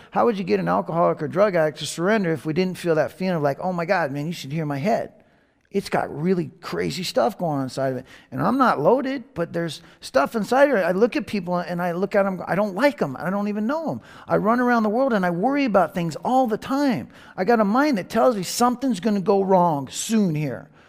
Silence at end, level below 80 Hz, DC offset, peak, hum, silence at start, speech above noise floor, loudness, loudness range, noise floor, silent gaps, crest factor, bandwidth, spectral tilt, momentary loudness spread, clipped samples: 0.25 s; -60 dBFS; under 0.1%; -4 dBFS; none; 0.15 s; 38 dB; -22 LUFS; 4 LU; -60 dBFS; none; 18 dB; 15.5 kHz; -6 dB/octave; 9 LU; under 0.1%